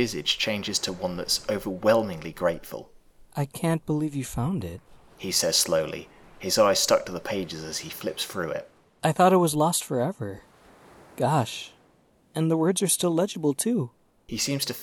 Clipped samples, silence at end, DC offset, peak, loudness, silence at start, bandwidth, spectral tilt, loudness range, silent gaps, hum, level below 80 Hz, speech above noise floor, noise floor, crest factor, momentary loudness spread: under 0.1%; 0 s; under 0.1%; -6 dBFS; -25 LUFS; 0 s; over 20 kHz; -4 dB/octave; 3 LU; none; none; -56 dBFS; 36 dB; -61 dBFS; 22 dB; 16 LU